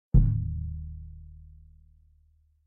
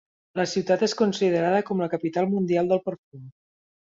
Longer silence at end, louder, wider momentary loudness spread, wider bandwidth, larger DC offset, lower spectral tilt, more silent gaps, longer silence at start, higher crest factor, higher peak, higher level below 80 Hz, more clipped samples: first, 1.25 s vs 0.55 s; second, -29 LUFS vs -24 LUFS; first, 26 LU vs 7 LU; second, 1.5 kHz vs 7.8 kHz; neither; first, -15 dB/octave vs -6 dB/octave; second, none vs 2.98-3.12 s; second, 0.15 s vs 0.35 s; about the same, 20 dB vs 16 dB; about the same, -8 dBFS vs -8 dBFS; first, -32 dBFS vs -68 dBFS; neither